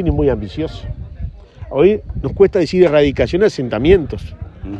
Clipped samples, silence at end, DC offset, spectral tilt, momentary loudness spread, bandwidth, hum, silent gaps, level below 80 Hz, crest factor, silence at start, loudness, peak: under 0.1%; 0 s; under 0.1%; -7.5 dB/octave; 18 LU; 8.4 kHz; none; none; -28 dBFS; 16 dB; 0 s; -15 LUFS; 0 dBFS